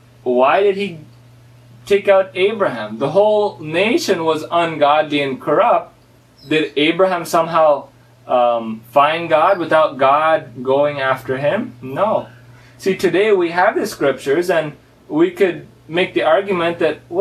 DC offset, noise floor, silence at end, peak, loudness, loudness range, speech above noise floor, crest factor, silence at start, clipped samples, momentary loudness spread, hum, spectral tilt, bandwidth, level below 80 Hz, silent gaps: under 0.1%; -44 dBFS; 0 s; 0 dBFS; -16 LUFS; 2 LU; 29 dB; 16 dB; 0.25 s; under 0.1%; 6 LU; none; -5 dB/octave; 14.5 kHz; -60 dBFS; none